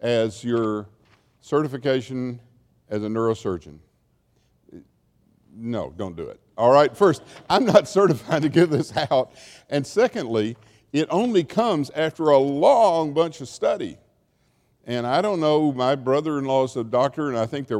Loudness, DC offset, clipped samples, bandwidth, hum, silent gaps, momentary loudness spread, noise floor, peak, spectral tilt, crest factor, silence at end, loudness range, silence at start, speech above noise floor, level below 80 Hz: -22 LUFS; under 0.1%; under 0.1%; 14 kHz; none; none; 14 LU; -65 dBFS; 0 dBFS; -6 dB/octave; 22 dB; 0 s; 11 LU; 0 s; 44 dB; -60 dBFS